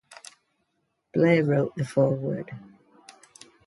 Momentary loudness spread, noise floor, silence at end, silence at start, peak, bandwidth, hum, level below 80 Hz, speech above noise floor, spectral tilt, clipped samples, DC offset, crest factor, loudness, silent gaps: 24 LU; -76 dBFS; 1.1 s; 1.15 s; -8 dBFS; 11.5 kHz; none; -68 dBFS; 52 dB; -7.5 dB/octave; under 0.1%; under 0.1%; 18 dB; -24 LUFS; none